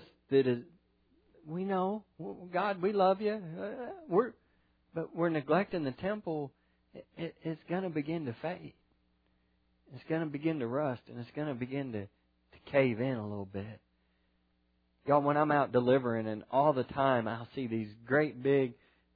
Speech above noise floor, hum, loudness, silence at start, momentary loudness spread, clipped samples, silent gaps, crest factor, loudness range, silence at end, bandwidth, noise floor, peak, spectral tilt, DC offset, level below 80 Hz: 42 dB; none; -33 LUFS; 0 s; 15 LU; under 0.1%; none; 20 dB; 8 LU; 0.45 s; 5 kHz; -74 dBFS; -14 dBFS; -6 dB/octave; under 0.1%; -72 dBFS